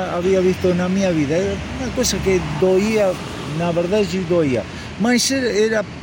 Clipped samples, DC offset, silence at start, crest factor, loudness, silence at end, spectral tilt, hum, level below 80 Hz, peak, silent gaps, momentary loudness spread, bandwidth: under 0.1%; under 0.1%; 0 s; 12 dB; -18 LUFS; 0 s; -5 dB/octave; none; -38 dBFS; -6 dBFS; none; 7 LU; 17 kHz